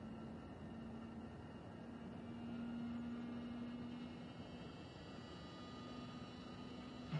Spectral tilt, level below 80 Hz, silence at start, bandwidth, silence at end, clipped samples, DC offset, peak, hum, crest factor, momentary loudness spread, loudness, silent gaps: -7 dB/octave; -70 dBFS; 0 s; 10.5 kHz; 0 s; under 0.1%; under 0.1%; -32 dBFS; none; 18 dB; 6 LU; -51 LUFS; none